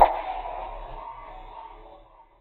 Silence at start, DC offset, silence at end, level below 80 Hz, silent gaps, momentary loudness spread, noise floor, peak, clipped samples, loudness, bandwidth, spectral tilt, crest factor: 0 s; under 0.1%; 0.2 s; -44 dBFS; none; 18 LU; -52 dBFS; -2 dBFS; under 0.1%; -31 LUFS; 14 kHz; -7.5 dB/octave; 26 dB